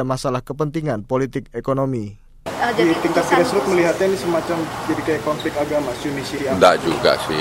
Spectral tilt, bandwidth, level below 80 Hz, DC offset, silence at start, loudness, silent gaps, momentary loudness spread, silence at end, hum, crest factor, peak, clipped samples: -5 dB/octave; 16.5 kHz; -46 dBFS; under 0.1%; 0 s; -19 LUFS; none; 9 LU; 0 s; none; 20 dB; 0 dBFS; under 0.1%